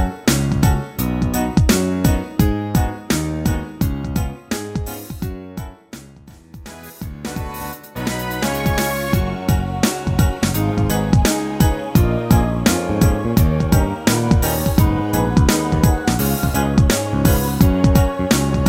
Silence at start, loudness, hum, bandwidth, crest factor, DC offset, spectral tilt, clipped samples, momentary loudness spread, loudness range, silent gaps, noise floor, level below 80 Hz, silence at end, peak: 0 s; -18 LUFS; none; 16.5 kHz; 16 dB; under 0.1%; -5.5 dB/octave; under 0.1%; 13 LU; 11 LU; none; -42 dBFS; -26 dBFS; 0 s; 0 dBFS